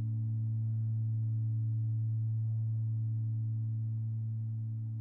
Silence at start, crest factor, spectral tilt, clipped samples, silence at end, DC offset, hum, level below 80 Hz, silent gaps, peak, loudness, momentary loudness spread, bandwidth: 0 s; 6 dB; -13 dB/octave; under 0.1%; 0 s; under 0.1%; none; -66 dBFS; none; -28 dBFS; -35 LUFS; 3 LU; 0.8 kHz